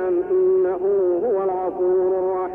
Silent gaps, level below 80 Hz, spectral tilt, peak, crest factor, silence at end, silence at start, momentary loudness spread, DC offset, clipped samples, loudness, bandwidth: none; -58 dBFS; -10.5 dB/octave; -12 dBFS; 8 dB; 0 s; 0 s; 4 LU; under 0.1%; under 0.1%; -20 LUFS; 2.7 kHz